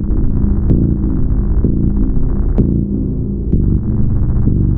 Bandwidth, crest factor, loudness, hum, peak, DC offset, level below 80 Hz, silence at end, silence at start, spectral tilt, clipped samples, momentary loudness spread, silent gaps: 1.9 kHz; 12 dB; -16 LUFS; none; -2 dBFS; under 0.1%; -16 dBFS; 0 s; 0 s; -14.5 dB/octave; under 0.1%; 4 LU; none